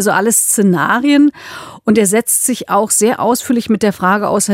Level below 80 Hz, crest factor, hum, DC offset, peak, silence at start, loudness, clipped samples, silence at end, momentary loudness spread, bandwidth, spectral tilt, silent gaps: -56 dBFS; 12 dB; none; under 0.1%; 0 dBFS; 0 s; -12 LUFS; under 0.1%; 0 s; 5 LU; 16.5 kHz; -4 dB/octave; none